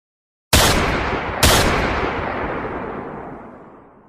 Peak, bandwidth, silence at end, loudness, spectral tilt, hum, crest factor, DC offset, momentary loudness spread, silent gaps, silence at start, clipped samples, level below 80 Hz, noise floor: 0 dBFS; 15.5 kHz; 0.35 s; -18 LUFS; -3.5 dB/octave; none; 20 dB; under 0.1%; 18 LU; none; 0.5 s; under 0.1%; -30 dBFS; -44 dBFS